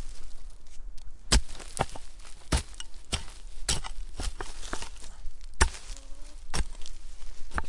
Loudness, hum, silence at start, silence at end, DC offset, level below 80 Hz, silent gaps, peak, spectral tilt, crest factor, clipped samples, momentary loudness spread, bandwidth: -33 LUFS; none; 0 s; 0 s; under 0.1%; -36 dBFS; none; -6 dBFS; -3 dB/octave; 24 dB; under 0.1%; 22 LU; 11.5 kHz